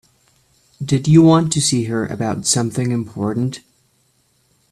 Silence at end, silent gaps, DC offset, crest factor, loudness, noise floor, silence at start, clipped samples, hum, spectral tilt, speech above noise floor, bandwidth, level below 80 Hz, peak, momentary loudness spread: 1.15 s; none; under 0.1%; 18 dB; -17 LUFS; -61 dBFS; 0.8 s; under 0.1%; none; -5.5 dB/octave; 45 dB; 13.5 kHz; -50 dBFS; 0 dBFS; 12 LU